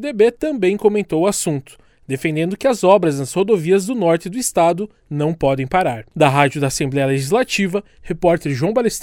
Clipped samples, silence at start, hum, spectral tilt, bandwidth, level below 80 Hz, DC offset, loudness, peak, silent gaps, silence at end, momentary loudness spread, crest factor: under 0.1%; 0 s; none; -5.5 dB/octave; 17.5 kHz; -46 dBFS; under 0.1%; -17 LUFS; 0 dBFS; none; 0 s; 8 LU; 18 dB